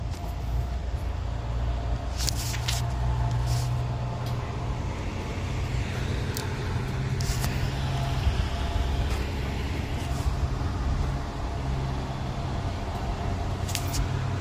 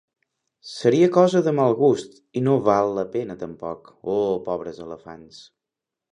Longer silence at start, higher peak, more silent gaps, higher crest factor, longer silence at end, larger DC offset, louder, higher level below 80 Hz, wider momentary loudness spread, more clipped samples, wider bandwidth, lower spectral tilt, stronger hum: second, 0 s vs 0.65 s; about the same, -4 dBFS vs -2 dBFS; neither; about the same, 24 dB vs 20 dB; second, 0 s vs 0.7 s; neither; second, -30 LUFS vs -21 LUFS; first, -32 dBFS vs -62 dBFS; second, 5 LU vs 20 LU; neither; first, 16 kHz vs 10 kHz; second, -5.5 dB/octave vs -7 dB/octave; neither